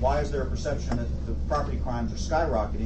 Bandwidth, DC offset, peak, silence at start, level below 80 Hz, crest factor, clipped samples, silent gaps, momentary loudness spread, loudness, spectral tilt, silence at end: 8.4 kHz; under 0.1%; -12 dBFS; 0 s; -30 dBFS; 16 dB; under 0.1%; none; 5 LU; -29 LUFS; -6.5 dB/octave; 0 s